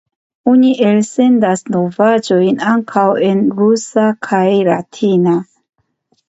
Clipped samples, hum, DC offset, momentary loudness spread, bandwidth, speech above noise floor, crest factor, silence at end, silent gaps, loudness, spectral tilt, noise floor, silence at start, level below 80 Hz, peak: under 0.1%; none; under 0.1%; 5 LU; 8.2 kHz; 50 dB; 12 dB; 0.85 s; none; -13 LUFS; -6.5 dB/octave; -61 dBFS; 0.45 s; -62 dBFS; 0 dBFS